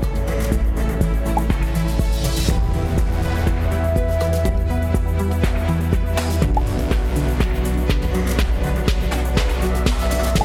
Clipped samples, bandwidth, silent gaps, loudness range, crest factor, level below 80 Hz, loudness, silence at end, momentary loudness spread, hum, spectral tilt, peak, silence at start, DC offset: under 0.1%; 16 kHz; none; 0 LU; 14 dB; -20 dBFS; -20 LUFS; 0 s; 1 LU; none; -6 dB/octave; -4 dBFS; 0 s; under 0.1%